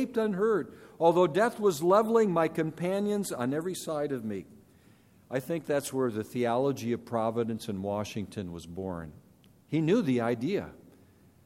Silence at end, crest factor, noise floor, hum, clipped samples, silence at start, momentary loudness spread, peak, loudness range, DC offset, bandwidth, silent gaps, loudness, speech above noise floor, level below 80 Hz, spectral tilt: 0.7 s; 20 dB; -60 dBFS; none; under 0.1%; 0 s; 13 LU; -10 dBFS; 7 LU; under 0.1%; 16 kHz; none; -29 LUFS; 31 dB; -66 dBFS; -6 dB/octave